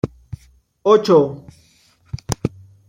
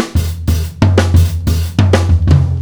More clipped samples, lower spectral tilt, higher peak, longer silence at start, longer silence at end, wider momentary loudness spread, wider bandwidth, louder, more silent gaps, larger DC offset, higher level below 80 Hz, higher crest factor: second, under 0.1% vs 0.4%; about the same, -6.5 dB/octave vs -6.5 dB/octave; about the same, -2 dBFS vs 0 dBFS; about the same, 0.05 s vs 0 s; first, 0.4 s vs 0 s; first, 25 LU vs 6 LU; second, 16 kHz vs over 20 kHz; second, -18 LUFS vs -13 LUFS; neither; neither; second, -46 dBFS vs -20 dBFS; first, 18 dB vs 12 dB